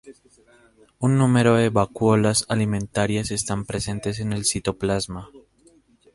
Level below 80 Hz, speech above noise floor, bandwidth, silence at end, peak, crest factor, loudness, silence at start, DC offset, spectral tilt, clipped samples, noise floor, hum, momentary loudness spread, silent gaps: -48 dBFS; 35 dB; 11.5 kHz; 0.75 s; -4 dBFS; 20 dB; -22 LUFS; 0.05 s; under 0.1%; -5 dB/octave; under 0.1%; -57 dBFS; none; 9 LU; none